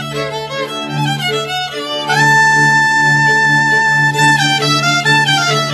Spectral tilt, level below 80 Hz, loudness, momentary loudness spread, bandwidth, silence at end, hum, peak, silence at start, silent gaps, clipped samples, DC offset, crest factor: -3 dB/octave; -54 dBFS; -11 LUFS; 11 LU; 14 kHz; 0 s; none; 0 dBFS; 0 s; none; under 0.1%; under 0.1%; 12 dB